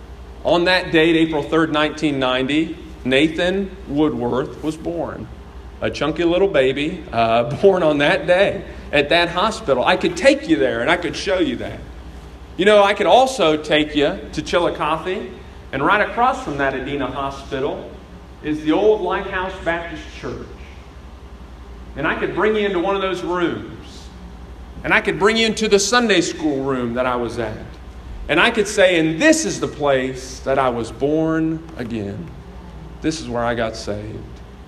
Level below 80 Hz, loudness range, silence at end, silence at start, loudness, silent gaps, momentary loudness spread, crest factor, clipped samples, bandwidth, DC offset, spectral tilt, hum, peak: -40 dBFS; 6 LU; 0 s; 0 s; -18 LUFS; none; 20 LU; 20 dB; under 0.1%; 13 kHz; under 0.1%; -4.5 dB/octave; none; 0 dBFS